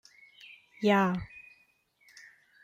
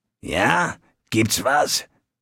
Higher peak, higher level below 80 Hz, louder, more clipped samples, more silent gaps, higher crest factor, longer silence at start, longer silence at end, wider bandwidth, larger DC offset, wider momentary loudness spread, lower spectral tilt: second, -12 dBFS vs -2 dBFS; second, -62 dBFS vs -50 dBFS; second, -28 LUFS vs -21 LUFS; neither; neither; about the same, 22 dB vs 20 dB; first, 0.8 s vs 0.25 s; first, 1.2 s vs 0.4 s; second, 14 kHz vs 17 kHz; neither; first, 26 LU vs 8 LU; first, -6.5 dB/octave vs -3 dB/octave